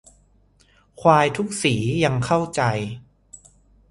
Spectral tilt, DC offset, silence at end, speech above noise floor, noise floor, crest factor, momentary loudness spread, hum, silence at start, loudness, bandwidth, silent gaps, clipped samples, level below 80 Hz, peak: -5.5 dB/octave; under 0.1%; 0.55 s; 38 dB; -58 dBFS; 22 dB; 11 LU; 50 Hz at -50 dBFS; 1 s; -20 LUFS; 11.5 kHz; none; under 0.1%; -52 dBFS; 0 dBFS